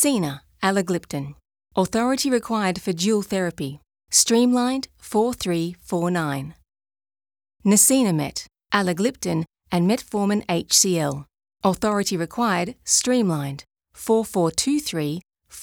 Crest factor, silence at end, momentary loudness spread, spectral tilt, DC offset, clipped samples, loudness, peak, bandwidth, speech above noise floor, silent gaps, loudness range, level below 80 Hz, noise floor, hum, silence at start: 20 dB; 0 s; 13 LU; -4 dB/octave; under 0.1%; under 0.1%; -22 LUFS; -2 dBFS; over 20 kHz; over 68 dB; none; 3 LU; -56 dBFS; under -90 dBFS; none; 0 s